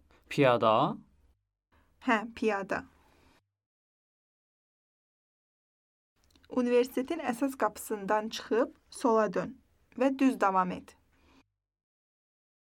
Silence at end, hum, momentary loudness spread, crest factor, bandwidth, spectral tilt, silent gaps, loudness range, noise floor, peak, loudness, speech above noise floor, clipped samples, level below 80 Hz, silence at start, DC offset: 1.95 s; none; 11 LU; 22 dB; 17 kHz; -5.5 dB/octave; 3.66-6.16 s; 6 LU; -68 dBFS; -10 dBFS; -30 LUFS; 39 dB; under 0.1%; -70 dBFS; 0.3 s; under 0.1%